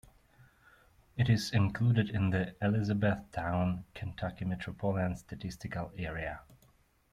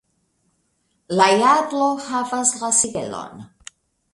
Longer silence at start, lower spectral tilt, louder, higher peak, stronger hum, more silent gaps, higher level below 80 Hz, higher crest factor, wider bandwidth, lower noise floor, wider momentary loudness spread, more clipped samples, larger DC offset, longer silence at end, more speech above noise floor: about the same, 1.15 s vs 1.1 s; first, -7 dB/octave vs -2.5 dB/octave; second, -33 LUFS vs -18 LUFS; second, -16 dBFS vs 0 dBFS; neither; neither; first, -56 dBFS vs -62 dBFS; about the same, 18 dB vs 20 dB; first, 13.5 kHz vs 11.5 kHz; about the same, -67 dBFS vs -68 dBFS; second, 12 LU vs 17 LU; neither; neither; about the same, 0.6 s vs 0.7 s; second, 35 dB vs 49 dB